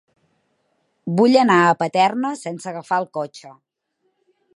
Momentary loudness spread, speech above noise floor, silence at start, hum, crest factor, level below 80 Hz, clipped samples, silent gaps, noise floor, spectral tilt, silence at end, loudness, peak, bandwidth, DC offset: 16 LU; 53 dB; 1.05 s; none; 20 dB; -74 dBFS; under 0.1%; none; -71 dBFS; -5.5 dB/octave; 1.05 s; -18 LUFS; -2 dBFS; 11.5 kHz; under 0.1%